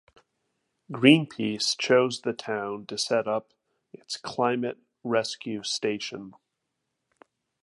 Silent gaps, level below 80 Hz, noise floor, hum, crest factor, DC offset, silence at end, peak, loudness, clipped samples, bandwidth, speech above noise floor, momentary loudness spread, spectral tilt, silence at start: none; -74 dBFS; -81 dBFS; none; 26 dB; under 0.1%; 1.3 s; -2 dBFS; -26 LUFS; under 0.1%; 11.5 kHz; 55 dB; 15 LU; -4 dB/octave; 0.9 s